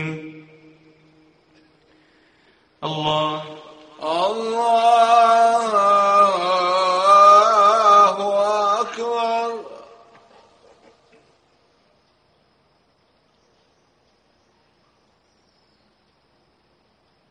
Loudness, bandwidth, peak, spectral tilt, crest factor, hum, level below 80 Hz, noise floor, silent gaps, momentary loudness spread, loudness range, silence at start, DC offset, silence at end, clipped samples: -16 LUFS; 10 kHz; -2 dBFS; -3.5 dB/octave; 18 dB; none; -68 dBFS; -62 dBFS; none; 19 LU; 15 LU; 0 s; under 0.1%; 7.5 s; under 0.1%